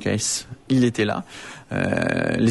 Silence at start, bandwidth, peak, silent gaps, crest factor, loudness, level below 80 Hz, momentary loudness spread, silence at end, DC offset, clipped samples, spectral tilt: 0 s; 11.5 kHz; -8 dBFS; none; 16 dB; -23 LUFS; -52 dBFS; 10 LU; 0 s; under 0.1%; under 0.1%; -4.5 dB/octave